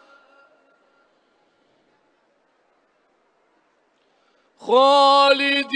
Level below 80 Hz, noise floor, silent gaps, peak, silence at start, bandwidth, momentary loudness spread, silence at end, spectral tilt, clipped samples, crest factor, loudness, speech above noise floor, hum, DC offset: -84 dBFS; -64 dBFS; none; -2 dBFS; 4.65 s; 10 kHz; 7 LU; 0 s; -2 dB/octave; under 0.1%; 20 dB; -15 LUFS; 49 dB; none; under 0.1%